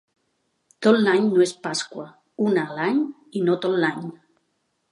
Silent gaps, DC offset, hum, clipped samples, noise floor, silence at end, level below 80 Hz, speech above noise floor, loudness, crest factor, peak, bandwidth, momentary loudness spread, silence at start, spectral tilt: none; under 0.1%; none; under 0.1%; -72 dBFS; 0.75 s; -76 dBFS; 51 dB; -22 LUFS; 18 dB; -4 dBFS; 11.5 kHz; 16 LU; 0.8 s; -5 dB/octave